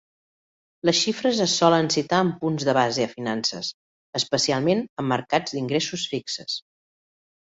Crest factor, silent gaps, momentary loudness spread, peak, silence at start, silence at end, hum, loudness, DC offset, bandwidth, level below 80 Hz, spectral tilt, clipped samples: 22 dB; 3.74-4.13 s, 4.89-4.97 s; 10 LU; -4 dBFS; 0.85 s; 0.85 s; none; -23 LUFS; under 0.1%; 8 kHz; -64 dBFS; -4 dB/octave; under 0.1%